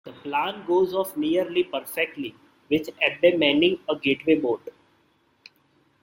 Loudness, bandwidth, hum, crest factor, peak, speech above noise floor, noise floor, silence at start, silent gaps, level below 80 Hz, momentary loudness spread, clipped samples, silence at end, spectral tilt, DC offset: -24 LUFS; 16.5 kHz; none; 20 dB; -4 dBFS; 41 dB; -65 dBFS; 0.05 s; none; -66 dBFS; 9 LU; under 0.1%; 1.3 s; -5 dB/octave; under 0.1%